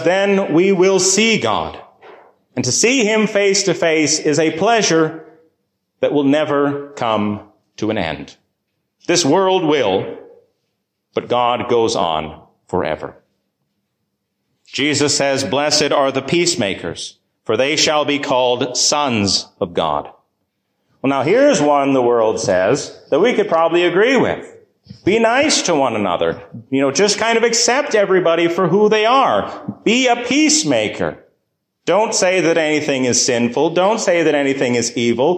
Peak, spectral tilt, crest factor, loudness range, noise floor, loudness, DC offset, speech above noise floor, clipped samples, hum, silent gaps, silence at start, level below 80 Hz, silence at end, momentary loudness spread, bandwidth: -2 dBFS; -3.5 dB/octave; 14 dB; 5 LU; -72 dBFS; -15 LUFS; under 0.1%; 57 dB; under 0.1%; none; none; 0 s; -52 dBFS; 0 s; 10 LU; 15 kHz